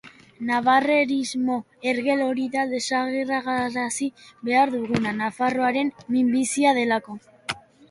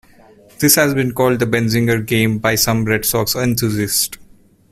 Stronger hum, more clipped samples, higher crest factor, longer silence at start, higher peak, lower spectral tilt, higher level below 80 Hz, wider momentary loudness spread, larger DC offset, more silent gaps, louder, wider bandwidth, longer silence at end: neither; neither; about the same, 18 dB vs 16 dB; second, 0.05 s vs 0.6 s; second, -6 dBFS vs 0 dBFS; about the same, -4 dB/octave vs -4 dB/octave; second, -64 dBFS vs -44 dBFS; first, 13 LU vs 5 LU; neither; neither; second, -23 LUFS vs -15 LUFS; second, 11.5 kHz vs 16 kHz; second, 0.3 s vs 0.55 s